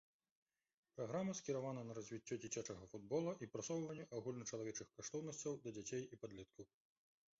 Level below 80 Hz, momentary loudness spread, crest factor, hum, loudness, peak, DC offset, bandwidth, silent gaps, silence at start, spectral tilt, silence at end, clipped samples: -80 dBFS; 11 LU; 18 dB; none; -48 LUFS; -32 dBFS; under 0.1%; 7.6 kHz; none; 0.95 s; -6.5 dB/octave; 0.75 s; under 0.1%